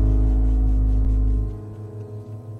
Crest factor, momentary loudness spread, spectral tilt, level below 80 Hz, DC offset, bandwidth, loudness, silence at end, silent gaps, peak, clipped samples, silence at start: 10 dB; 15 LU; -10.5 dB/octave; -20 dBFS; under 0.1%; 1.5 kHz; -22 LUFS; 0 s; none; -10 dBFS; under 0.1%; 0 s